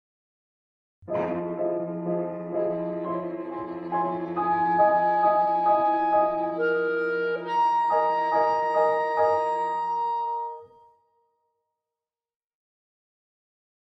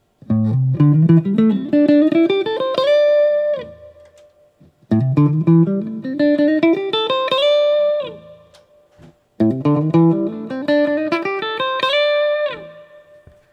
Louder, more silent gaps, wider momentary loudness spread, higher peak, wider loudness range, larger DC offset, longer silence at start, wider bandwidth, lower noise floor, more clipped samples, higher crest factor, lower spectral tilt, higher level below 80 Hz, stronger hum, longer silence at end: second, -25 LUFS vs -16 LUFS; neither; about the same, 9 LU vs 9 LU; second, -10 dBFS vs -2 dBFS; first, 8 LU vs 4 LU; neither; first, 1.05 s vs 0.3 s; about the same, 8 kHz vs 7.8 kHz; first, under -90 dBFS vs -52 dBFS; neither; about the same, 16 dB vs 16 dB; about the same, -7.5 dB/octave vs -8.5 dB/octave; second, -70 dBFS vs -60 dBFS; neither; first, 3.3 s vs 0.7 s